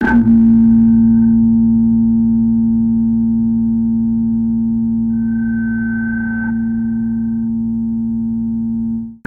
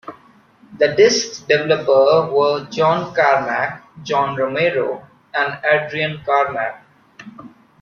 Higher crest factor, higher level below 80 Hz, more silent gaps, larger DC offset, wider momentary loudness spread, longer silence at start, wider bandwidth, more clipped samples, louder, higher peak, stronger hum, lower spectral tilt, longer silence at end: second, 10 dB vs 16 dB; first, -34 dBFS vs -60 dBFS; neither; neither; about the same, 9 LU vs 11 LU; about the same, 0 s vs 0.05 s; second, 2.4 kHz vs 7.2 kHz; neither; first, -14 LUFS vs -17 LUFS; about the same, -2 dBFS vs -2 dBFS; neither; first, -11 dB/octave vs -4 dB/octave; second, 0.1 s vs 0.35 s